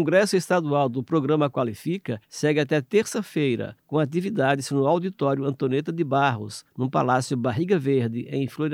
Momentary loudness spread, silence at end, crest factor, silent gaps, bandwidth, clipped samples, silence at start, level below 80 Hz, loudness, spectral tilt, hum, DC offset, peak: 7 LU; 0 s; 18 dB; none; 16 kHz; under 0.1%; 0 s; -70 dBFS; -24 LUFS; -6 dB/octave; none; under 0.1%; -6 dBFS